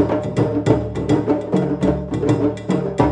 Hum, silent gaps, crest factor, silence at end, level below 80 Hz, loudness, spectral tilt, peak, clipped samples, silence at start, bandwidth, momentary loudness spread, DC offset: none; none; 16 dB; 0 s; -38 dBFS; -19 LUFS; -8 dB/octave; -2 dBFS; under 0.1%; 0 s; 9.8 kHz; 2 LU; under 0.1%